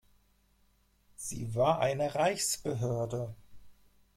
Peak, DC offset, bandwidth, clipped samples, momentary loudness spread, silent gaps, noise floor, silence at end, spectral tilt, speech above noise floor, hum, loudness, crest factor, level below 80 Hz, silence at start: -14 dBFS; under 0.1%; 16.5 kHz; under 0.1%; 12 LU; none; -69 dBFS; 0.45 s; -4.5 dB/octave; 38 dB; 50 Hz at -60 dBFS; -32 LUFS; 20 dB; -62 dBFS; 1.2 s